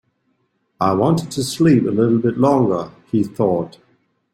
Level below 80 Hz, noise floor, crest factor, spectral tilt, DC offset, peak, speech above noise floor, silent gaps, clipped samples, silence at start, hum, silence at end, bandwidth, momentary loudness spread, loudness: -54 dBFS; -67 dBFS; 16 dB; -7 dB/octave; under 0.1%; -2 dBFS; 50 dB; none; under 0.1%; 0.8 s; none; 0.65 s; 16 kHz; 9 LU; -17 LUFS